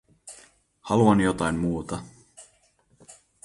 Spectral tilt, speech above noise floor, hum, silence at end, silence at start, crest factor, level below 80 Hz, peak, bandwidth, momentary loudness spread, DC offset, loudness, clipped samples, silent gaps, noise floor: -6.5 dB/octave; 42 dB; none; 0.3 s; 0.25 s; 20 dB; -50 dBFS; -8 dBFS; 11.5 kHz; 25 LU; under 0.1%; -24 LUFS; under 0.1%; none; -64 dBFS